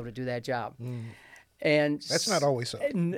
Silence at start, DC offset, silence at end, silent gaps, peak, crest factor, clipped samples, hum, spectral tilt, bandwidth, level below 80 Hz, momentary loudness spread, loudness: 0 s; under 0.1%; 0 s; none; -12 dBFS; 18 dB; under 0.1%; none; -4.5 dB/octave; 16.5 kHz; -66 dBFS; 14 LU; -29 LUFS